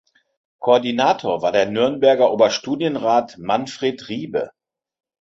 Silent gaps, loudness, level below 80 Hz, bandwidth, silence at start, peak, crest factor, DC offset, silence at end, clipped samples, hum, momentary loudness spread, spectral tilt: none; -19 LUFS; -62 dBFS; 8 kHz; 0.6 s; -2 dBFS; 18 dB; under 0.1%; 0.7 s; under 0.1%; none; 11 LU; -4.5 dB/octave